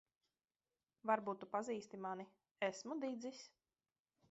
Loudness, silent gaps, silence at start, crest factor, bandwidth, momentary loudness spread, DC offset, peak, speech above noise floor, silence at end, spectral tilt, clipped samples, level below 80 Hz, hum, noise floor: -45 LUFS; 2.51-2.55 s; 1.05 s; 24 dB; 7.6 kHz; 14 LU; under 0.1%; -22 dBFS; over 46 dB; 0.85 s; -3.5 dB/octave; under 0.1%; under -90 dBFS; none; under -90 dBFS